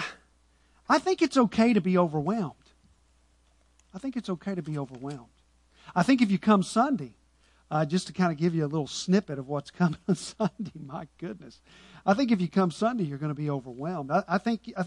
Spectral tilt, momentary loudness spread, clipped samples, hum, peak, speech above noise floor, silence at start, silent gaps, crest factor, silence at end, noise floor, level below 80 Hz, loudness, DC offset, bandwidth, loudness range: -6.5 dB/octave; 16 LU; under 0.1%; none; -8 dBFS; 37 dB; 0 s; none; 20 dB; 0 s; -64 dBFS; -64 dBFS; -27 LUFS; under 0.1%; 11 kHz; 6 LU